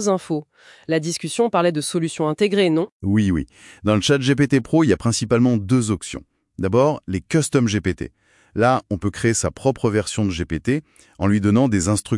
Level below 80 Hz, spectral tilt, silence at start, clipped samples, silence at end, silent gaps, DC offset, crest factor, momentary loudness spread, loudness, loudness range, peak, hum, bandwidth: -48 dBFS; -5.5 dB/octave; 0 s; under 0.1%; 0 s; 2.92-3.00 s; under 0.1%; 16 dB; 9 LU; -20 LUFS; 3 LU; -2 dBFS; none; 12 kHz